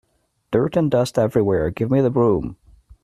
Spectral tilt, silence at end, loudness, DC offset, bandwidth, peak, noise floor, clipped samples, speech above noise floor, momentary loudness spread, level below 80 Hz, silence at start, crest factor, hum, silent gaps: -8 dB/octave; 0.5 s; -19 LUFS; under 0.1%; 14 kHz; -4 dBFS; -48 dBFS; under 0.1%; 30 dB; 6 LU; -46 dBFS; 0.5 s; 16 dB; none; none